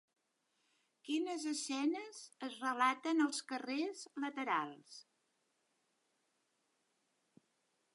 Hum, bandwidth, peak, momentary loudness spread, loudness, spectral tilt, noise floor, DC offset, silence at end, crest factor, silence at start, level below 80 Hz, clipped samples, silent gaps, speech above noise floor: none; 11.5 kHz; -20 dBFS; 16 LU; -39 LUFS; -2 dB/octave; -82 dBFS; under 0.1%; 2.9 s; 22 dB; 1.05 s; under -90 dBFS; under 0.1%; none; 44 dB